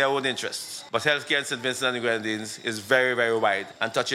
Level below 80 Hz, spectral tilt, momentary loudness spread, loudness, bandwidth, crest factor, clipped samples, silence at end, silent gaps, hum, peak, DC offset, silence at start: -76 dBFS; -2.5 dB/octave; 8 LU; -25 LUFS; 16 kHz; 20 dB; under 0.1%; 0 s; none; none; -6 dBFS; under 0.1%; 0 s